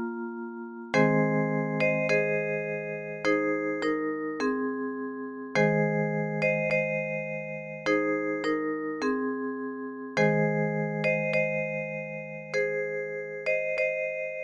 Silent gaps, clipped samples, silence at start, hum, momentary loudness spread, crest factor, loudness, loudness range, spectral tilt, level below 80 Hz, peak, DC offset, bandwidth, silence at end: none; under 0.1%; 0 s; none; 10 LU; 18 dB; -28 LUFS; 2 LU; -7 dB/octave; -70 dBFS; -10 dBFS; under 0.1%; 9.8 kHz; 0 s